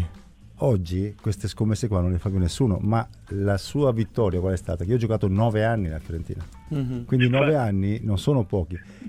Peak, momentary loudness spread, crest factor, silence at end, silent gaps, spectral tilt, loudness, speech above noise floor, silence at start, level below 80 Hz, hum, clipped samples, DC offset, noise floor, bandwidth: -6 dBFS; 10 LU; 18 dB; 0 s; none; -7.5 dB/octave; -24 LUFS; 23 dB; 0 s; -42 dBFS; none; under 0.1%; under 0.1%; -46 dBFS; 13 kHz